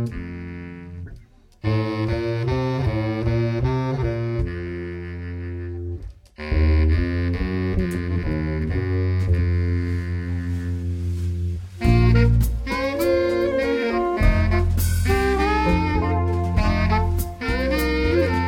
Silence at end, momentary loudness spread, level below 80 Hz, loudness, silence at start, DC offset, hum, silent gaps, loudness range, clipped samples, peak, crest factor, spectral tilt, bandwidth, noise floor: 0 s; 12 LU; -28 dBFS; -22 LUFS; 0 s; under 0.1%; none; none; 5 LU; under 0.1%; -4 dBFS; 16 dB; -7 dB/octave; 17 kHz; -46 dBFS